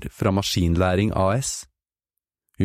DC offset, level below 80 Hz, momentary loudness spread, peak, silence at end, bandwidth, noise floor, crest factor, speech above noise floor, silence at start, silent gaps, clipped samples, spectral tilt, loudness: under 0.1%; -40 dBFS; 6 LU; -6 dBFS; 0 s; 15.5 kHz; -86 dBFS; 18 dB; 65 dB; 0 s; none; under 0.1%; -5.5 dB/octave; -22 LUFS